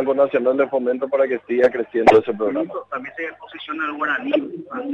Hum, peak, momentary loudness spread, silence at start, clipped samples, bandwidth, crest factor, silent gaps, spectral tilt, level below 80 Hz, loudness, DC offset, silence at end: none; -2 dBFS; 15 LU; 0 s; under 0.1%; 9 kHz; 16 dB; none; -6 dB/octave; -58 dBFS; -20 LUFS; under 0.1%; 0 s